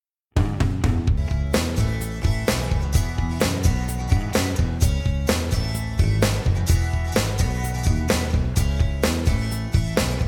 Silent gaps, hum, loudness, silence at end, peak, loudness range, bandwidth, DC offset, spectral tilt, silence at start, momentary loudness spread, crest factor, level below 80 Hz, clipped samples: none; none; -23 LUFS; 0 s; -6 dBFS; 1 LU; 18 kHz; under 0.1%; -5.5 dB/octave; 0.35 s; 3 LU; 16 dB; -26 dBFS; under 0.1%